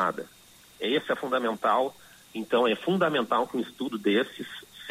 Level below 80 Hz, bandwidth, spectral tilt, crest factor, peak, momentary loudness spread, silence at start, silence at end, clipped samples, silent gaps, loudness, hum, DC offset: -72 dBFS; 16 kHz; -5 dB/octave; 16 dB; -12 dBFS; 15 LU; 0 s; 0 s; under 0.1%; none; -27 LUFS; none; under 0.1%